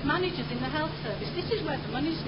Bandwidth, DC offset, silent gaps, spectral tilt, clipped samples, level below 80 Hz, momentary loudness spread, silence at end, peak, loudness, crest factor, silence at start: 5.6 kHz; 0.2%; none; -10 dB/octave; under 0.1%; -48 dBFS; 4 LU; 0 s; -14 dBFS; -31 LUFS; 16 dB; 0 s